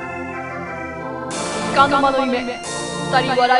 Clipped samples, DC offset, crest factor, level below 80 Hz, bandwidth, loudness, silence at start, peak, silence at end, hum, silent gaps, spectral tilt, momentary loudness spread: under 0.1%; under 0.1%; 18 dB; -48 dBFS; 11.5 kHz; -20 LUFS; 0 s; 0 dBFS; 0 s; none; none; -4 dB/octave; 13 LU